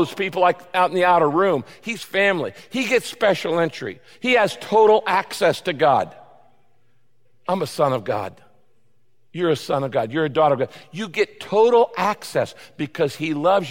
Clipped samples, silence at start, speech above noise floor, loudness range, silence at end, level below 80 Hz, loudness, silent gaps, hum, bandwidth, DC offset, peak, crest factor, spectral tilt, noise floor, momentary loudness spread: under 0.1%; 0 s; 48 dB; 6 LU; 0 s; -66 dBFS; -20 LUFS; none; none; 17 kHz; 0.3%; -4 dBFS; 16 dB; -5 dB/octave; -68 dBFS; 12 LU